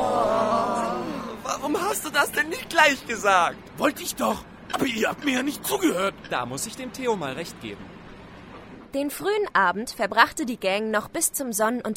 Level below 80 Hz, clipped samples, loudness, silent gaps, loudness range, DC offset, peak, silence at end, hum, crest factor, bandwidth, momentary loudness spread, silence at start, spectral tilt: -54 dBFS; under 0.1%; -24 LUFS; none; 6 LU; under 0.1%; -2 dBFS; 0 s; none; 22 dB; 16.5 kHz; 14 LU; 0 s; -3 dB/octave